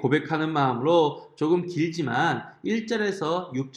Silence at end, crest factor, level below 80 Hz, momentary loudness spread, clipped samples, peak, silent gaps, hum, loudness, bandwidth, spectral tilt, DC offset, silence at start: 0.05 s; 16 dB; -70 dBFS; 7 LU; under 0.1%; -8 dBFS; none; none; -25 LUFS; 10.5 kHz; -6.5 dB/octave; under 0.1%; 0 s